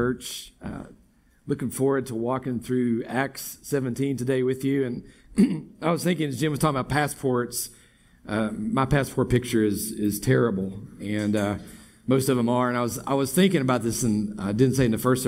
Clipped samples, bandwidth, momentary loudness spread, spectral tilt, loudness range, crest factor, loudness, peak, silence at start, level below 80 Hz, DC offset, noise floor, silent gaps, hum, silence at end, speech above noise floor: under 0.1%; 16 kHz; 10 LU; -5.5 dB/octave; 3 LU; 18 dB; -25 LUFS; -6 dBFS; 0 s; -48 dBFS; under 0.1%; -59 dBFS; none; none; 0 s; 35 dB